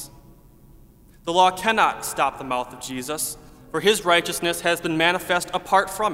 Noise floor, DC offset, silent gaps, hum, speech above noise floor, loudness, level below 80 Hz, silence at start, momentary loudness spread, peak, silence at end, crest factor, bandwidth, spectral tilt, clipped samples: -50 dBFS; under 0.1%; none; none; 28 dB; -22 LUFS; -52 dBFS; 0 s; 12 LU; -2 dBFS; 0 s; 20 dB; 16 kHz; -2.5 dB/octave; under 0.1%